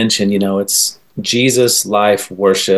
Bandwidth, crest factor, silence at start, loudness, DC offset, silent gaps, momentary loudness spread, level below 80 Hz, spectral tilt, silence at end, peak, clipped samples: 13 kHz; 12 dB; 0 s; -13 LUFS; 0.3%; none; 5 LU; -54 dBFS; -3 dB/octave; 0 s; -2 dBFS; under 0.1%